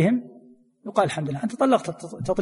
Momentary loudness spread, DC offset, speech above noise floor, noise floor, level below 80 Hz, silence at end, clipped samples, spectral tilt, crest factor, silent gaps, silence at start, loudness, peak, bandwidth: 12 LU; under 0.1%; 29 dB; -52 dBFS; -56 dBFS; 0 s; under 0.1%; -6.5 dB/octave; 18 dB; none; 0 s; -25 LUFS; -6 dBFS; 11.5 kHz